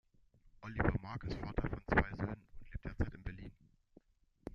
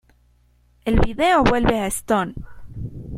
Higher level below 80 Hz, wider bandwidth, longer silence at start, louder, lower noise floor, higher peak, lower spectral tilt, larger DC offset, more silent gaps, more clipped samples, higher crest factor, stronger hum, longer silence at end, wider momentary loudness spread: second, -48 dBFS vs -30 dBFS; second, 7.2 kHz vs 16 kHz; second, 0.45 s vs 0.85 s; second, -40 LUFS vs -20 LUFS; first, -68 dBFS vs -58 dBFS; second, -14 dBFS vs -2 dBFS; first, -8.5 dB/octave vs -5 dB/octave; neither; neither; neither; first, 26 dB vs 18 dB; second, none vs 60 Hz at -40 dBFS; about the same, 0 s vs 0 s; about the same, 19 LU vs 19 LU